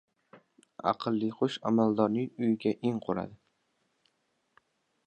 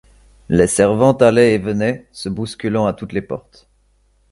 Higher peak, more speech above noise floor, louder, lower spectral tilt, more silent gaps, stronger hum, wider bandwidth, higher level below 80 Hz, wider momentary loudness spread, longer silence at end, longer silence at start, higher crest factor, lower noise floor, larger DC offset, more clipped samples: second, -12 dBFS vs 0 dBFS; first, 47 dB vs 42 dB; second, -30 LUFS vs -16 LUFS; first, -7.5 dB/octave vs -5.5 dB/octave; neither; neither; second, 8.4 kHz vs 11.5 kHz; second, -70 dBFS vs -44 dBFS; second, 8 LU vs 15 LU; first, 1.7 s vs 0.95 s; second, 0.35 s vs 0.5 s; about the same, 20 dB vs 18 dB; first, -76 dBFS vs -58 dBFS; neither; neither